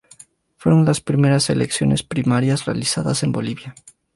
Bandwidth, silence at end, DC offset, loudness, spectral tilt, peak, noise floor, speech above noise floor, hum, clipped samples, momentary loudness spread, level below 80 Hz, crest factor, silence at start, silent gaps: 11.5 kHz; 0.45 s; under 0.1%; -19 LUFS; -5.5 dB/octave; -4 dBFS; -49 dBFS; 30 dB; none; under 0.1%; 9 LU; -48 dBFS; 14 dB; 0.6 s; none